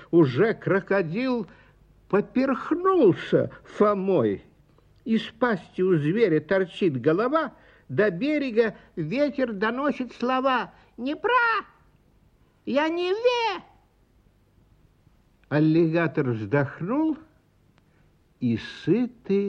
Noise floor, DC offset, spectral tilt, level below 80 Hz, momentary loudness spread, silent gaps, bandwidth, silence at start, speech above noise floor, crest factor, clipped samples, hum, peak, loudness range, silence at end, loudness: -61 dBFS; under 0.1%; -8 dB/octave; -62 dBFS; 9 LU; none; 7.8 kHz; 0 s; 38 dB; 18 dB; under 0.1%; none; -8 dBFS; 4 LU; 0 s; -24 LUFS